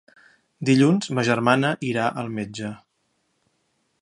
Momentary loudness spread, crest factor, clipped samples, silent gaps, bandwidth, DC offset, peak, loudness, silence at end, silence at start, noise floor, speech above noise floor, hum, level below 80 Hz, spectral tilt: 14 LU; 22 dB; under 0.1%; none; 11.5 kHz; under 0.1%; -2 dBFS; -22 LUFS; 1.25 s; 0.6 s; -71 dBFS; 50 dB; none; -64 dBFS; -6 dB/octave